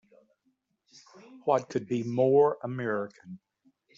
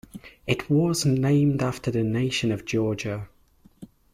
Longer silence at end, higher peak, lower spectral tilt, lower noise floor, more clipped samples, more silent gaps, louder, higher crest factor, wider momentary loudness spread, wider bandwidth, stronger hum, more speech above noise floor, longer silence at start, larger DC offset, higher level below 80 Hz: first, 0.6 s vs 0.3 s; about the same, -10 dBFS vs -8 dBFS; about the same, -6.5 dB/octave vs -6 dB/octave; first, -75 dBFS vs -53 dBFS; neither; neither; second, -28 LUFS vs -24 LUFS; about the same, 20 dB vs 16 dB; first, 24 LU vs 14 LU; second, 7.6 kHz vs 15 kHz; neither; first, 47 dB vs 30 dB; first, 1.3 s vs 0.15 s; neither; second, -74 dBFS vs -54 dBFS